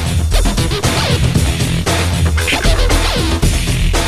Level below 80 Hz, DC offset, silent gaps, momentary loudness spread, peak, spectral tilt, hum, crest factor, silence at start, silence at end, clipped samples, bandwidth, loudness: -16 dBFS; 2%; none; 2 LU; -2 dBFS; -4.5 dB/octave; none; 12 dB; 0 s; 0 s; under 0.1%; 14.5 kHz; -14 LUFS